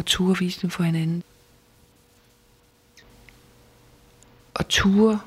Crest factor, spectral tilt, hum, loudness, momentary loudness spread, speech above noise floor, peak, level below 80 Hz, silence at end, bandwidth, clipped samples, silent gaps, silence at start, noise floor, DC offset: 20 dB; -5 dB/octave; none; -22 LUFS; 13 LU; 37 dB; -6 dBFS; -48 dBFS; 0 s; 15 kHz; under 0.1%; none; 0 s; -58 dBFS; under 0.1%